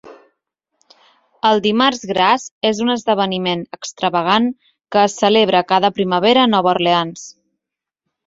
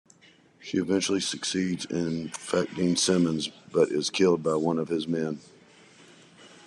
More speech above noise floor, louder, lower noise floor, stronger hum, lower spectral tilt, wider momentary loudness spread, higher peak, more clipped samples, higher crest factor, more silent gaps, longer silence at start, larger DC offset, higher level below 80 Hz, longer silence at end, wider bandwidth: first, 68 dB vs 32 dB; first, -16 LUFS vs -27 LUFS; first, -83 dBFS vs -58 dBFS; neither; about the same, -4.5 dB/octave vs -4.5 dB/octave; about the same, 9 LU vs 8 LU; first, -2 dBFS vs -10 dBFS; neither; about the same, 16 dB vs 18 dB; first, 2.51-2.61 s vs none; second, 0.05 s vs 0.6 s; neither; first, -60 dBFS vs -66 dBFS; first, 0.95 s vs 0.2 s; second, 7.8 kHz vs 12 kHz